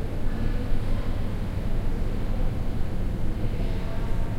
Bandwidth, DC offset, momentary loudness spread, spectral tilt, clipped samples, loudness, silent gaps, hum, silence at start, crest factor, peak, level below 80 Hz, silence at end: 5.6 kHz; under 0.1%; 1 LU; -7.5 dB/octave; under 0.1%; -31 LUFS; none; none; 0 s; 12 dB; -10 dBFS; -26 dBFS; 0 s